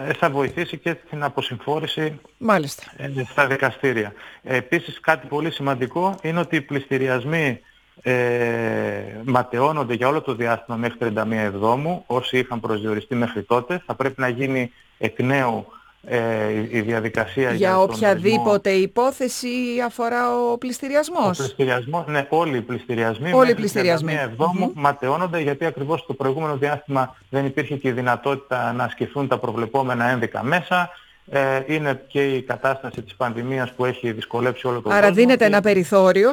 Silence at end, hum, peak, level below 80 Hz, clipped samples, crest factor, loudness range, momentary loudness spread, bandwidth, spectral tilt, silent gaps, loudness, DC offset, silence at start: 0 s; none; 0 dBFS; -60 dBFS; under 0.1%; 22 dB; 4 LU; 8 LU; 19 kHz; -6 dB/octave; none; -21 LUFS; under 0.1%; 0 s